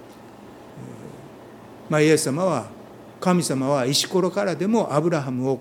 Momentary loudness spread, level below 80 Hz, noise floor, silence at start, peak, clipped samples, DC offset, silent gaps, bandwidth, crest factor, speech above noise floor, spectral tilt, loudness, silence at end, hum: 24 LU; -64 dBFS; -43 dBFS; 0 s; -4 dBFS; under 0.1%; under 0.1%; none; 17.5 kHz; 18 dB; 22 dB; -5 dB/octave; -22 LUFS; 0 s; none